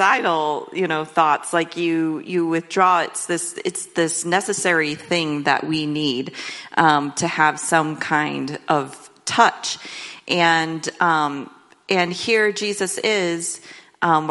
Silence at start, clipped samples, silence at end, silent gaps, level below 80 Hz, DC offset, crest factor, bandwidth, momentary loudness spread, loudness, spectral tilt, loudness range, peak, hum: 0 s; under 0.1%; 0 s; none; -68 dBFS; under 0.1%; 20 dB; 11.5 kHz; 10 LU; -20 LUFS; -3.5 dB/octave; 1 LU; 0 dBFS; none